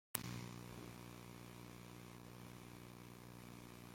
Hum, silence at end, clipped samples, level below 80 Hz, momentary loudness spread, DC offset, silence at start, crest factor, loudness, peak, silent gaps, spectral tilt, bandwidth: 60 Hz at -60 dBFS; 0 s; under 0.1%; -70 dBFS; 8 LU; under 0.1%; 0.15 s; 42 dB; -54 LUFS; -10 dBFS; none; -4 dB/octave; 16.5 kHz